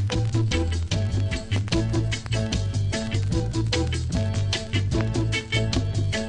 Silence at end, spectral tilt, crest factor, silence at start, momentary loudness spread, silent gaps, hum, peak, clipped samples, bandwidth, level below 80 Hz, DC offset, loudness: 0 s; -5.5 dB/octave; 14 dB; 0 s; 2 LU; none; none; -10 dBFS; under 0.1%; 10.5 kHz; -32 dBFS; under 0.1%; -25 LUFS